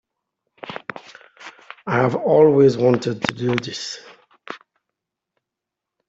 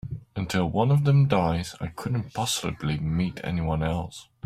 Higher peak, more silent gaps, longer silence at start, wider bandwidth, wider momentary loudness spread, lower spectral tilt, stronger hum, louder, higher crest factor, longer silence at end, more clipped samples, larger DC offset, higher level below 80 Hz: first, 0 dBFS vs -8 dBFS; neither; first, 0.65 s vs 0.05 s; second, 7.8 kHz vs 15 kHz; first, 25 LU vs 13 LU; about the same, -6 dB/octave vs -6 dB/octave; neither; first, -18 LUFS vs -26 LUFS; about the same, 22 dB vs 18 dB; first, 1.5 s vs 0.2 s; neither; neither; second, -62 dBFS vs -46 dBFS